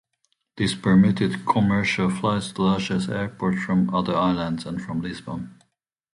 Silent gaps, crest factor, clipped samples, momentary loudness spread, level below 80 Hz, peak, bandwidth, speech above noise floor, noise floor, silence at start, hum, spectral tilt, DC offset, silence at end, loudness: none; 16 dB; under 0.1%; 11 LU; -50 dBFS; -6 dBFS; 11 kHz; 51 dB; -73 dBFS; 0.55 s; none; -6.5 dB/octave; under 0.1%; 0.65 s; -23 LUFS